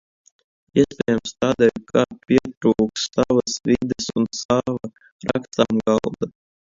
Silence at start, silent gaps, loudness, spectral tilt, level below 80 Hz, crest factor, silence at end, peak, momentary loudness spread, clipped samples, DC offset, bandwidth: 0.75 s; 2.57-2.61 s, 4.45-4.49 s, 5.12-5.19 s; -21 LUFS; -5 dB/octave; -50 dBFS; 20 dB; 0.4 s; 0 dBFS; 9 LU; under 0.1%; under 0.1%; 7.8 kHz